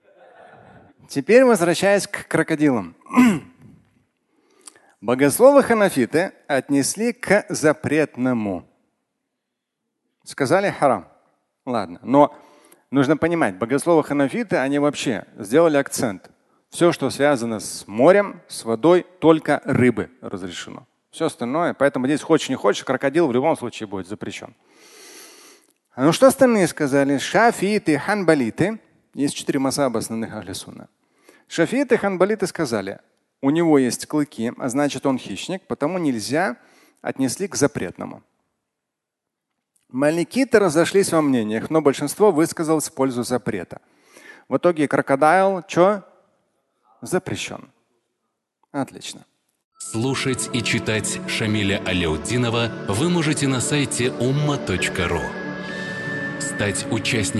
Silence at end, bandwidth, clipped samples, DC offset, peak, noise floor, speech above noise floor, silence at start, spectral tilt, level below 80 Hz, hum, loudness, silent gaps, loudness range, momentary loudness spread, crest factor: 0 s; 12.5 kHz; under 0.1%; under 0.1%; 0 dBFS; -82 dBFS; 63 dB; 1.1 s; -5 dB/octave; -52 dBFS; none; -20 LUFS; 49.64-49.71 s; 6 LU; 14 LU; 20 dB